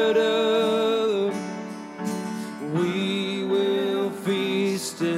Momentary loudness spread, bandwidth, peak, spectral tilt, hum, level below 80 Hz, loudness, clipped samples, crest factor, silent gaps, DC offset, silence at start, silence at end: 11 LU; 15.5 kHz; -12 dBFS; -5 dB/octave; none; -74 dBFS; -25 LUFS; under 0.1%; 12 dB; none; under 0.1%; 0 s; 0 s